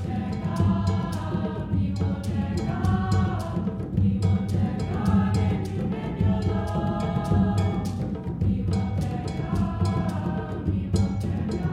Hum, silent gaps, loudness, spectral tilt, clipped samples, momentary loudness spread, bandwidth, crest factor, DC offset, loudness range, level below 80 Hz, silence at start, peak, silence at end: none; none; -26 LUFS; -8 dB/octave; under 0.1%; 6 LU; 11 kHz; 14 dB; under 0.1%; 2 LU; -38 dBFS; 0 s; -10 dBFS; 0 s